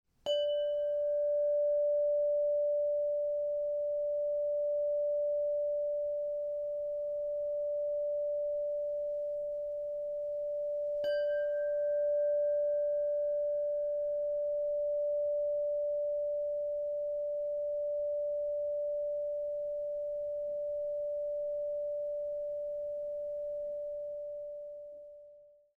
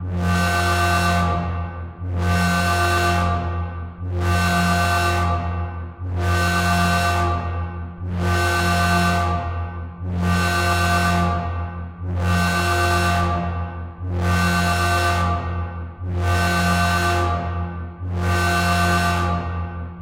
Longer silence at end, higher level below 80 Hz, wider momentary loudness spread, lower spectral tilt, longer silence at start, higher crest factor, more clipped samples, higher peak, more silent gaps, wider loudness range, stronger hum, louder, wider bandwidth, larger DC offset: first, 0.3 s vs 0 s; second, -70 dBFS vs -34 dBFS; second, 7 LU vs 10 LU; second, -3.5 dB/octave vs -5 dB/octave; first, 0.25 s vs 0 s; about the same, 10 dB vs 14 dB; neither; second, -24 dBFS vs -6 dBFS; neither; first, 5 LU vs 2 LU; neither; second, -34 LUFS vs -20 LUFS; second, 5 kHz vs 16 kHz; neither